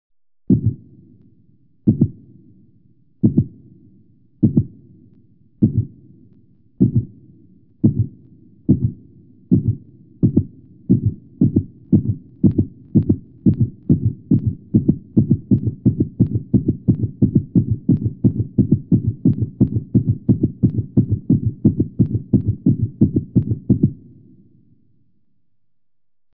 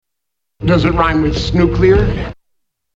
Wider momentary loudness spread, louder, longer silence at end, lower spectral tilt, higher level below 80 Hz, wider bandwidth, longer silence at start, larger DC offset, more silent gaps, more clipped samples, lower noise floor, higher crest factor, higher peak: second, 5 LU vs 10 LU; second, -19 LUFS vs -14 LUFS; first, 2.4 s vs 0.65 s; first, -16 dB/octave vs -7.5 dB/octave; second, -40 dBFS vs -24 dBFS; second, 1.1 kHz vs 7.8 kHz; about the same, 0.5 s vs 0.6 s; neither; neither; neither; first, -85 dBFS vs -79 dBFS; about the same, 18 dB vs 14 dB; about the same, 0 dBFS vs 0 dBFS